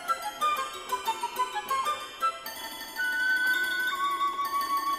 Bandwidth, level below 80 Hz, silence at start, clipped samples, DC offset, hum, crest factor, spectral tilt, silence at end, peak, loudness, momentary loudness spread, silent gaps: 17 kHz; -66 dBFS; 0 s; under 0.1%; under 0.1%; none; 12 dB; 0 dB/octave; 0 s; -18 dBFS; -29 LUFS; 7 LU; none